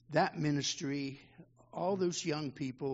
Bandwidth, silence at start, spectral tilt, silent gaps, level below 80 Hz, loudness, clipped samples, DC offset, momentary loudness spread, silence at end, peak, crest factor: 7.6 kHz; 0.1 s; -4.5 dB/octave; none; -72 dBFS; -35 LUFS; under 0.1%; under 0.1%; 10 LU; 0 s; -16 dBFS; 20 dB